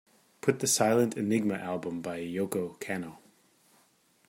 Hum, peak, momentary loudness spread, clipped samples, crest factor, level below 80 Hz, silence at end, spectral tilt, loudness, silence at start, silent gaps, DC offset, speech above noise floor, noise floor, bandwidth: none; -10 dBFS; 11 LU; under 0.1%; 22 dB; -72 dBFS; 1.1 s; -4 dB/octave; -30 LUFS; 0.45 s; none; under 0.1%; 37 dB; -67 dBFS; 16.5 kHz